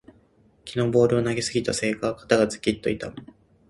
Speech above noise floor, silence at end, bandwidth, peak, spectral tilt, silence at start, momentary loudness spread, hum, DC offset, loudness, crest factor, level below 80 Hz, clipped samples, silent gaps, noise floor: 36 dB; 0.45 s; 11.5 kHz; -2 dBFS; -5 dB/octave; 0.65 s; 13 LU; none; under 0.1%; -24 LUFS; 22 dB; -52 dBFS; under 0.1%; none; -59 dBFS